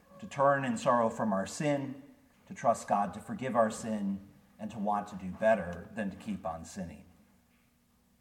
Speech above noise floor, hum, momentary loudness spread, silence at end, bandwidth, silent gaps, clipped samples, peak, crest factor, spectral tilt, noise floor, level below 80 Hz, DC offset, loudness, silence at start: 37 dB; none; 15 LU; 1.2 s; 16 kHz; none; under 0.1%; -14 dBFS; 18 dB; -6 dB/octave; -69 dBFS; -66 dBFS; under 0.1%; -32 LUFS; 0.1 s